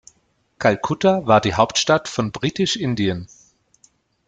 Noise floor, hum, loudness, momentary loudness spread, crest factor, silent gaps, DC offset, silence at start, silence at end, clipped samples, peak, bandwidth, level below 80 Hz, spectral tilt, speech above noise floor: -64 dBFS; none; -19 LUFS; 8 LU; 20 dB; none; under 0.1%; 0.6 s; 1.05 s; under 0.1%; 0 dBFS; 9.4 kHz; -52 dBFS; -4.5 dB/octave; 45 dB